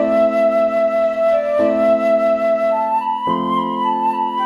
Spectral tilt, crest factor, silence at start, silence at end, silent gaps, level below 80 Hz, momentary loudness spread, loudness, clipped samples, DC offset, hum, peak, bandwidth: -6.5 dB/octave; 12 dB; 0 s; 0 s; none; -54 dBFS; 4 LU; -16 LUFS; under 0.1%; under 0.1%; none; -4 dBFS; 7 kHz